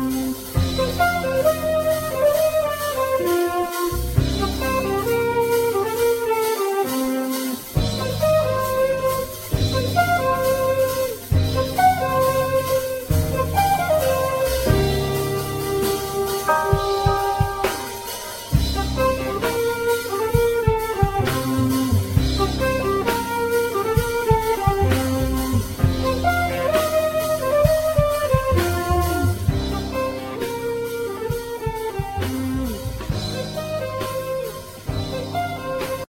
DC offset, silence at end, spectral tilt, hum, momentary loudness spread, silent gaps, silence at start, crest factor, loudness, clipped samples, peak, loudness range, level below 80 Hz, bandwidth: under 0.1%; 0.05 s; -5.5 dB/octave; none; 7 LU; none; 0 s; 18 dB; -21 LUFS; under 0.1%; -2 dBFS; 6 LU; -32 dBFS; 16.5 kHz